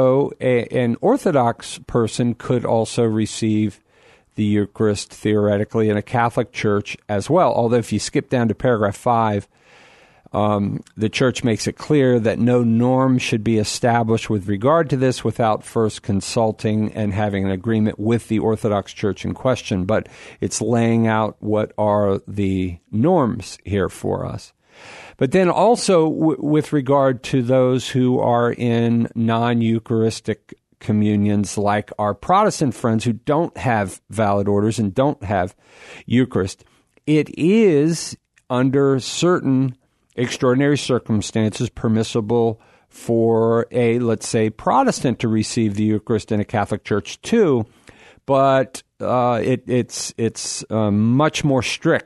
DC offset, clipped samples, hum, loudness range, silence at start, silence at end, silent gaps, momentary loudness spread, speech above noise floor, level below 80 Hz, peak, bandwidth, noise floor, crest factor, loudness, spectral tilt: under 0.1%; under 0.1%; none; 3 LU; 0 s; 0.05 s; none; 8 LU; 35 dB; -52 dBFS; -4 dBFS; 12.5 kHz; -53 dBFS; 16 dB; -19 LUFS; -6 dB/octave